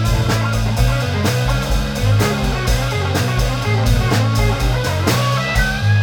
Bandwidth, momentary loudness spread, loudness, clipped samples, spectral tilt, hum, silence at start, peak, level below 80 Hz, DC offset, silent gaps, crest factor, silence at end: over 20 kHz; 3 LU; -17 LUFS; under 0.1%; -5 dB/octave; none; 0 s; -2 dBFS; -22 dBFS; under 0.1%; none; 14 dB; 0 s